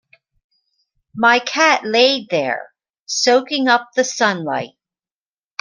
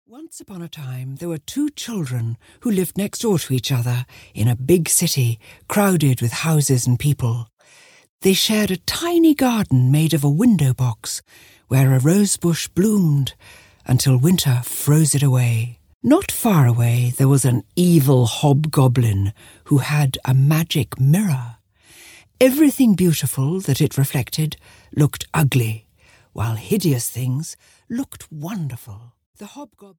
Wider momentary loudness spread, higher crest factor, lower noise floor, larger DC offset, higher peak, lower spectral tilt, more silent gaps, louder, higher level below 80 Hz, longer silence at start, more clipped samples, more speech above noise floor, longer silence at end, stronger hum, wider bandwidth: about the same, 12 LU vs 14 LU; about the same, 18 dB vs 16 dB; first, under -90 dBFS vs -50 dBFS; neither; about the same, 0 dBFS vs -2 dBFS; second, -2.5 dB/octave vs -5.5 dB/octave; second, 2.90-2.94 s, 3.00-3.06 s vs 7.53-7.57 s, 8.09-8.19 s, 15.94-16.00 s, 29.26-29.33 s; about the same, -16 LUFS vs -18 LUFS; second, -68 dBFS vs -50 dBFS; first, 1.15 s vs 0.15 s; neither; first, over 74 dB vs 32 dB; first, 0.95 s vs 0.15 s; neither; second, 10 kHz vs over 20 kHz